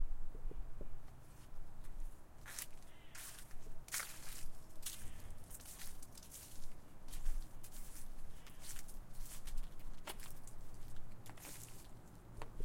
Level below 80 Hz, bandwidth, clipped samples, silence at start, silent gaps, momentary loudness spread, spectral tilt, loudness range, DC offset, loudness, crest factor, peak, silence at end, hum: -48 dBFS; 16.5 kHz; under 0.1%; 0 s; none; 10 LU; -2.5 dB/octave; 5 LU; under 0.1%; -53 LUFS; 16 dB; -24 dBFS; 0 s; none